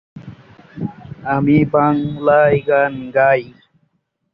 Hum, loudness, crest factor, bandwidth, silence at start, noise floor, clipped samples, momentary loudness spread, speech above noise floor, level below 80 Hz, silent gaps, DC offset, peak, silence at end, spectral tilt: none; -15 LUFS; 14 dB; 5.2 kHz; 0.15 s; -65 dBFS; under 0.1%; 15 LU; 51 dB; -50 dBFS; none; under 0.1%; -2 dBFS; 0.85 s; -10.5 dB/octave